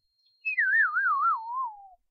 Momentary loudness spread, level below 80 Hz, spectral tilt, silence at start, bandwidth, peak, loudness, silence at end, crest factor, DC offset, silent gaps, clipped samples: 12 LU; -82 dBFS; 1 dB/octave; 0.45 s; 5.6 kHz; -16 dBFS; -25 LUFS; 0.25 s; 12 dB; under 0.1%; none; under 0.1%